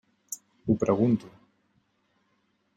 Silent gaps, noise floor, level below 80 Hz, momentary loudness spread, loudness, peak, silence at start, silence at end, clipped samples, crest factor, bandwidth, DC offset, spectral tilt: none; -72 dBFS; -60 dBFS; 17 LU; -26 LUFS; -10 dBFS; 0.3 s; 1.5 s; under 0.1%; 20 dB; 16.5 kHz; under 0.1%; -7.5 dB/octave